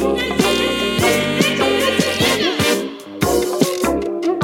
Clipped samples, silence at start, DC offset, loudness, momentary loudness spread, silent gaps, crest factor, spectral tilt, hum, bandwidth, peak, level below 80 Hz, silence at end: under 0.1%; 0 s; under 0.1%; -17 LUFS; 5 LU; none; 16 dB; -3.5 dB/octave; none; 17 kHz; 0 dBFS; -40 dBFS; 0 s